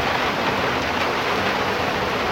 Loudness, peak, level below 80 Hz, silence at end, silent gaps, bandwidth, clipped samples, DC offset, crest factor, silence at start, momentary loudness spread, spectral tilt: -21 LUFS; -8 dBFS; -44 dBFS; 0 s; none; 16 kHz; under 0.1%; under 0.1%; 14 dB; 0 s; 1 LU; -4 dB/octave